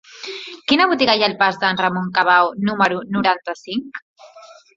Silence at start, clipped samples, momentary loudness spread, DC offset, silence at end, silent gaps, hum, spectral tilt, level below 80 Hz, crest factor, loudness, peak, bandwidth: 0.15 s; under 0.1%; 15 LU; under 0.1%; 0.3 s; 4.02-4.14 s; none; -5 dB/octave; -60 dBFS; 18 dB; -17 LUFS; 0 dBFS; 7.8 kHz